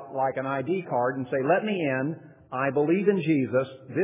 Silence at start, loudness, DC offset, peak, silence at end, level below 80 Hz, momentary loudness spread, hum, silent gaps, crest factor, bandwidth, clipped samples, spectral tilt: 0 s; -26 LUFS; under 0.1%; -10 dBFS; 0 s; -70 dBFS; 7 LU; none; none; 16 dB; 3.8 kHz; under 0.1%; -11 dB/octave